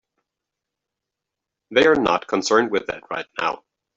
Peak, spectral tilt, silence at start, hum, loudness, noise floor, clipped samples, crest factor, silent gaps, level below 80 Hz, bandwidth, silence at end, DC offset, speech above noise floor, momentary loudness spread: -2 dBFS; -3.5 dB/octave; 1.7 s; none; -20 LUFS; -84 dBFS; under 0.1%; 20 dB; none; -58 dBFS; 7.8 kHz; 0.4 s; under 0.1%; 64 dB; 13 LU